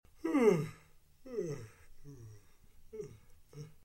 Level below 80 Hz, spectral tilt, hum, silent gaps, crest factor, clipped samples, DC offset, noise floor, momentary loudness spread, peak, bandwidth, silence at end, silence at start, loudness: -62 dBFS; -7 dB/octave; none; none; 22 dB; under 0.1%; under 0.1%; -62 dBFS; 27 LU; -16 dBFS; 16.5 kHz; 0.15 s; 0.25 s; -34 LUFS